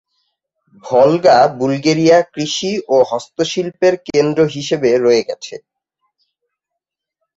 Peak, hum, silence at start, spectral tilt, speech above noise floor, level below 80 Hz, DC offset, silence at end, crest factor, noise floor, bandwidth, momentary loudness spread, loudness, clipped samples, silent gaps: -2 dBFS; none; 0.85 s; -5 dB/octave; 67 dB; -58 dBFS; under 0.1%; 1.8 s; 14 dB; -80 dBFS; 8 kHz; 9 LU; -14 LUFS; under 0.1%; none